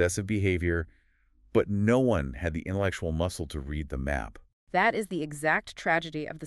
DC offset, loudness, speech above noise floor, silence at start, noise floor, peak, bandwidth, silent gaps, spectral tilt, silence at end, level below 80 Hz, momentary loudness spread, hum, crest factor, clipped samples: under 0.1%; -29 LUFS; 35 dB; 0 s; -63 dBFS; -10 dBFS; 13 kHz; 4.53-4.67 s; -6 dB/octave; 0 s; -42 dBFS; 10 LU; none; 18 dB; under 0.1%